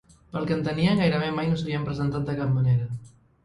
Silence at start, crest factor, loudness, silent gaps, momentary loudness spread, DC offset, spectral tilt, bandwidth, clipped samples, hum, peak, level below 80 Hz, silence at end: 0.35 s; 16 dB; -25 LUFS; none; 10 LU; under 0.1%; -8 dB/octave; 10.5 kHz; under 0.1%; none; -8 dBFS; -50 dBFS; 0.35 s